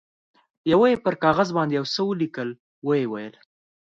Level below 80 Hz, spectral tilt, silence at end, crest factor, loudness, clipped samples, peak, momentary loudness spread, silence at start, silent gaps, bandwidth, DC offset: -60 dBFS; -6.5 dB/octave; 0.55 s; 18 dB; -23 LUFS; under 0.1%; -6 dBFS; 14 LU; 0.65 s; 2.60-2.82 s; 7.8 kHz; under 0.1%